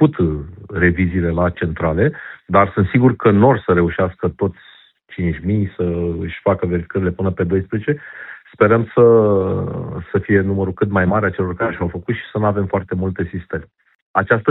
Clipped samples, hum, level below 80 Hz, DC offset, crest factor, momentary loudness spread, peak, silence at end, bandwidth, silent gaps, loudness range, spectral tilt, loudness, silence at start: under 0.1%; none; -40 dBFS; under 0.1%; 16 dB; 11 LU; 0 dBFS; 0 s; 4.1 kHz; 13.95-14.14 s; 5 LU; -12.5 dB/octave; -17 LUFS; 0 s